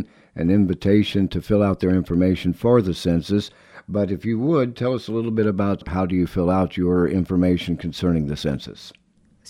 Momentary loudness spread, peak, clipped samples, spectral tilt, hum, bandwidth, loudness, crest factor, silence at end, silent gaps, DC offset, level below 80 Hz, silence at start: 7 LU; -4 dBFS; under 0.1%; -8 dB/octave; none; 13.5 kHz; -21 LUFS; 18 dB; 0.6 s; none; under 0.1%; -42 dBFS; 0 s